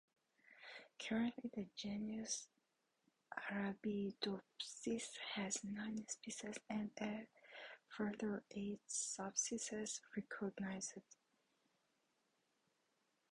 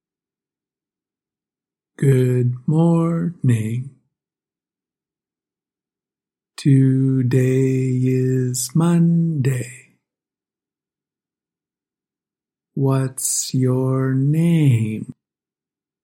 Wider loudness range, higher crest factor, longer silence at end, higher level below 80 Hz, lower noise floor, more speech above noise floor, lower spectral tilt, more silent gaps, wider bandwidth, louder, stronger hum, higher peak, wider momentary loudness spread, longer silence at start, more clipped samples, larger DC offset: second, 3 LU vs 10 LU; first, 22 dB vs 16 dB; first, 2.15 s vs 0.9 s; second, -80 dBFS vs -62 dBFS; second, -85 dBFS vs under -90 dBFS; second, 39 dB vs over 73 dB; second, -3 dB/octave vs -7 dB/octave; neither; second, 11 kHz vs 16.5 kHz; second, -46 LUFS vs -18 LUFS; neither; second, -26 dBFS vs -4 dBFS; first, 13 LU vs 9 LU; second, 0.5 s vs 2 s; neither; neither